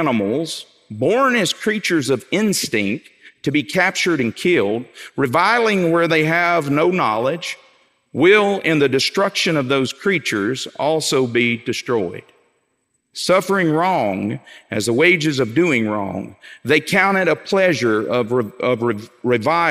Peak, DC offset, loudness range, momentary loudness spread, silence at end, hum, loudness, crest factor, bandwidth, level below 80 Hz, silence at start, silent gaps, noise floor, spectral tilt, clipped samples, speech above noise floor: -2 dBFS; under 0.1%; 3 LU; 12 LU; 0 s; none; -18 LUFS; 16 dB; 16 kHz; -66 dBFS; 0 s; none; -69 dBFS; -4.5 dB/octave; under 0.1%; 51 dB